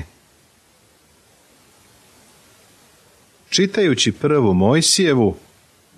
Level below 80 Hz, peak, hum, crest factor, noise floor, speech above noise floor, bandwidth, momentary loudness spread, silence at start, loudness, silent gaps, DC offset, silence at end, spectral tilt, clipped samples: -54 dBFS; -2 dBFS; none; 18 dB; -55 dBFS; 39 dB; 14 kHz; 7 LU; 0 s; -16 LUFS; none; under 0.1%; 0.6 s; -4 dB/octave; under 0.1%